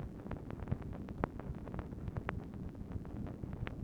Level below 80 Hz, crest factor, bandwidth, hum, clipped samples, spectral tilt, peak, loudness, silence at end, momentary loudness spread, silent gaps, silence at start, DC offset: -50 dBFS; 30 dB; 17 kHz; none; under 0.1%; -9 dB/octave; -14 dBFS; -44 LUFS; 0 s; 4 LU; none; 0 s; under 0.1%